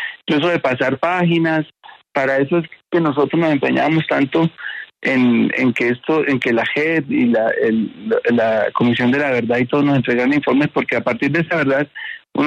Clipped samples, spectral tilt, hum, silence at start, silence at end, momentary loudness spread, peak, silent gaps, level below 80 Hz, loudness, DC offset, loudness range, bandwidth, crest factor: under 0.1%; -7.5 dB/octave; none; 0 s; 0 s; 5 LU; -4 dBFS; none; -58 dBFS; -17 LUFS; under 0.1%; 1 LU; 8.2 kHz; 12 dB